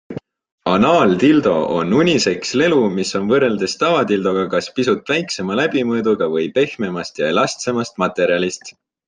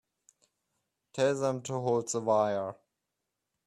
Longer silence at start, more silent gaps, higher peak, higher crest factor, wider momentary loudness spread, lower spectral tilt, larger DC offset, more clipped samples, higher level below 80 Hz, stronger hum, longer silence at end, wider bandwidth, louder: second, 0.1 s vs 1.15 s; first, 0.52-0.58 s vs none; first, -2 dBFS vs -14 dBFS; about the same, 16 dB vs 18 dB; about the same, 8 LU vs 9 LU; about the same, -5 dB/octave vs -5 dB/octave; neither; neither; first, -56 dBFS vs -76 dBFS; neither; second, 0.35 s vs 0.9 s; second, 9.8 kHz vs 12.5 kHz; first, -17 LUFS vs -30 LUFS